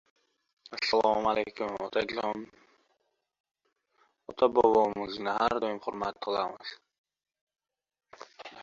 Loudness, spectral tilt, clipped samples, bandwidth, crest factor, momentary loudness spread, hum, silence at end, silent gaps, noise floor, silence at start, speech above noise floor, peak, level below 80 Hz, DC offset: -29 LUFS; -4.5 dB/octave; under 0.1%; 7.6 kHz; 22 dB; 19 LU; none; 0 s; 3.40-3.44 s, 6.98-7.04 s, 7.41-7.47 s; -77 dBFS; 0.7 s; 48 dB; -10 dBFS; -66 dBFS; under 0.1%